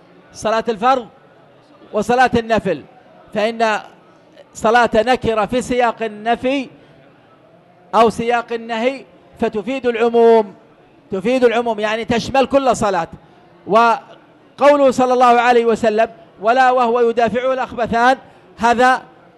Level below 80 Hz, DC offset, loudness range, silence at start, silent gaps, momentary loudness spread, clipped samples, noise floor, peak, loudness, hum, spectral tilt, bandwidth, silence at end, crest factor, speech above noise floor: -48 dBFS; under 0.1%; 5 LU; 0.35 s; none; 10 LU; under 0.1%; -48 dBFS; -2 dBFS; -16 LUFS; none; -4.5 dB/octave; 12 kHz; 0.35 s; 14 dB; 33 dB